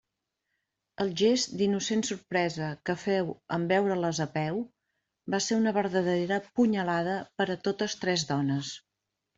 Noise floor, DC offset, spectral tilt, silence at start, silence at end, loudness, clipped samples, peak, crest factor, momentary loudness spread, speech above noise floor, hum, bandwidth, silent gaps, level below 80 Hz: -84 dBFS; under 0.1%; -4.5 dB/octave; 1 s; 0.6 s; -29 LUFS; under 0.1%; -12 dBFS; 16 dB; 7 LU; 55 dB; none; 8.2 kHz; none; -68 dBFS